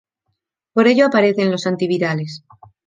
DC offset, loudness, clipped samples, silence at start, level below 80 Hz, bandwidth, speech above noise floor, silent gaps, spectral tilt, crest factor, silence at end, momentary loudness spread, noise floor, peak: under 0.1%; -16 LUFS; under 0.1%; 0.75 s; -66 dBFS; 9.4 kHz; 57 dB; none; -6 dB/octave; 16 dB; 0.5 s; 13 LU; -74 dBFS; -2 dBFS